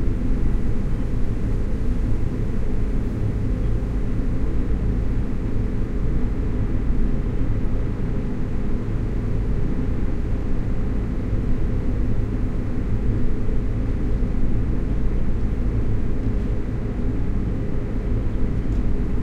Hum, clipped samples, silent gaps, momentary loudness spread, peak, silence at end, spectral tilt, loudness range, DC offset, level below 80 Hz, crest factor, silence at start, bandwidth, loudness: none; under 0.1%; none; 2 LU; -8 dBFS; 0 s; -9.5 dB/octave; 1 LU; under 0.1%; -22 dBFS; 12 dB; 0 s; 4.4 kHz; -26 LUFS